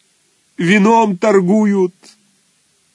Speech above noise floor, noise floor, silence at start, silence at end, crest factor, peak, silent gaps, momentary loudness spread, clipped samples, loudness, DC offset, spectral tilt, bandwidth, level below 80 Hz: 46 dB; -58 dBFS; 0.6 s; 1.05 s; 14 dB; 0 dBFS; none; 9 LU; under 0.1%; -13 LUFS; under 0.1%; -6.5 dB/octave; 10 kHz; -68 dBFS